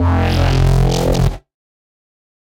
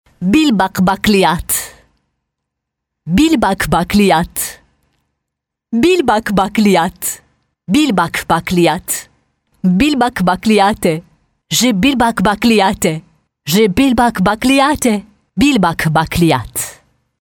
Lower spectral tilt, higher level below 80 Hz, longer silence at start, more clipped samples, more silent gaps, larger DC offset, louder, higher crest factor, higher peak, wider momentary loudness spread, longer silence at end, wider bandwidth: first, -6.5 dB/octave vs -4.5 dB/octave; first, -22 dBFS vs -36 dBFS; second, 0 s vs 0.2 s; neither; neither; neither; about the same, -15 LUFS vs -13 LUFS; about the same, 14 dB vs 14 dB; about the same, -2 dBFS vs 0 dBFS; second, 6 LU vs 10 LU; first, 1.15 s vs 0.45 s; second, 16.5 kHz vs 19.5 kHz